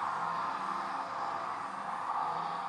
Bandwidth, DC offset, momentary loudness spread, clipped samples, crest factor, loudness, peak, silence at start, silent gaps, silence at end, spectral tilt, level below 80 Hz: 11.5 kHz; under 0.1%; 4 LU; under 0.1%; 14 dB; -36 LUFS; -22 dBFS; 0 s; none; 0 s; -4 dB/octave; -82 dBFS